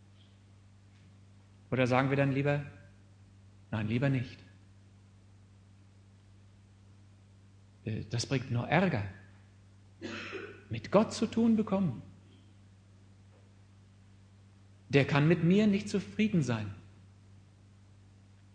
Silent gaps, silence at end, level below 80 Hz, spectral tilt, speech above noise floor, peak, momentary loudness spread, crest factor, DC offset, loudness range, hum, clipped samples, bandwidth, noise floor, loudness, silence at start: none; 1.65 s; -66 dBFS; -7 dB/octave; 29 dB; -10 dBFS; 18 LU; 24 dB; under 0.1%; 9 LU; none; under 0.1%; 9.8 kHz; -58 dBFS; -31 LUFS; 1.7 s